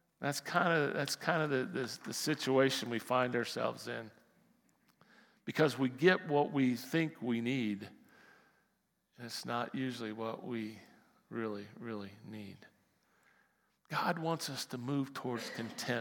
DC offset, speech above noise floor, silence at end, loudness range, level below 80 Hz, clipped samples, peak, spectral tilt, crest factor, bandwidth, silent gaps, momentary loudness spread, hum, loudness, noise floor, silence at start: under 0.1%; 44 dB; 0 s; 10 LU; -90 dBFS; under 0.1%; -12 dBFS; -5 dB/octave; 26 dB; 18 kHz; none; 15 LU; none; -35 LUFS; -79 dBFS; 0.2 s